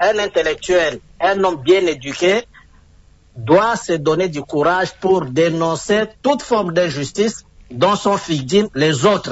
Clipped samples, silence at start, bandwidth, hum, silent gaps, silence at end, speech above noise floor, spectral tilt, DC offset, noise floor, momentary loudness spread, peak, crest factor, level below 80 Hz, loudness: under 0.1%; 0 s; 8 kHz; none; none; 0 s; 32 dB; -5 dB/octave; under 0.1%; -48 dBFS; 6 LU; -2 dBFS; 14 dB; -48 dBFS; -17 LUFS